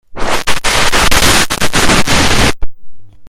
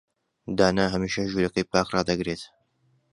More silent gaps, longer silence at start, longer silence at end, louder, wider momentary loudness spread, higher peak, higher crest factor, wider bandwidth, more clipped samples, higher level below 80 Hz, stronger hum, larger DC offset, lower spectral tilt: neither; second, 0.1 s vs 0.45 s; second, 0 s vs 0.65 s; first, -10 LUFS vs -25 LUFS; second, 7 LU vs 13 LU; first, 0 dBFS vs -4 dBFS; second, 10 dB vs 24 dB; first, 16.5 kHz vs 11 kHz; first, 0.3% vs under 0.1%; first, -20 dBFS vs -50 dBFS; neither; neither; second, -2.5 dB/octave vs -5 dB/octave